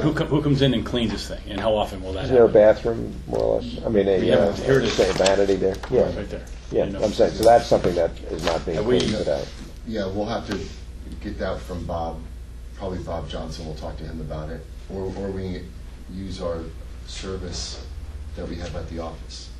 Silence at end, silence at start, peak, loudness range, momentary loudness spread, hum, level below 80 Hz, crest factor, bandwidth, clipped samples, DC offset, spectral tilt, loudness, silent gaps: 0 s; 0 s; -4 dBFS; 12 LU; 18 LU; none; -36 dBFS; 20 dB; 13.5 kHz; under 0.1%; under 0.1%; -5.5 dB/octave; -23 LUFS; none